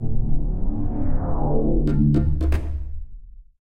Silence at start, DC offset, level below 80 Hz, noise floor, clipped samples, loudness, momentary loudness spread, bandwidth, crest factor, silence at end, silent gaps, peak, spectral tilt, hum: 0 s; under 0.1%; -24 dBFS; -40 dBFS; under 0.1%; -24 LUFS; 13 LU; 3.9 kHz; 12 dB; 0.15 s; none; -6 dBFS; -10.5 dB/octave; none